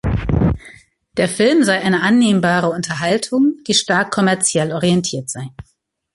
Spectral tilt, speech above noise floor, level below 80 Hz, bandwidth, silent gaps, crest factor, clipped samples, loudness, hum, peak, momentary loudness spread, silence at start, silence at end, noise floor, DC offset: -4.5 dB/octave; 30 dB; -34 dBFS; 11.5 kHz; none; 14 dB; under 0.1%; -16 LUFS; none; -2 dBFS; 11 LU; 0.05 s; 0.5 s; -45 dBFS; under 0.1%